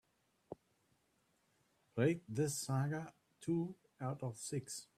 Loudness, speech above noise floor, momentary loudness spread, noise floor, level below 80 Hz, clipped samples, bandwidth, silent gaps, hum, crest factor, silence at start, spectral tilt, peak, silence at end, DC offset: -41 LUFS; 39 dB; 19 LU; -79 dBFS; -78 dBFS; under 0.1%; 15.5 kHz; none; none; 20 dB; 0.5 s; -5.5 dB/octave; -22 dBFS; 0.15 s; under 0.1%